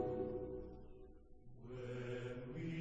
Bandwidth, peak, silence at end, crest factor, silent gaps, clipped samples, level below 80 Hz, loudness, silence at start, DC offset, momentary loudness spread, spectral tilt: 8.6 kHz; -30 dBFS; 0 s; 16 dB; none; under 0.1%; -60 dBFS; -47 LUFS; 0 s; under 0.1%; 19 LU; -8 dB/octave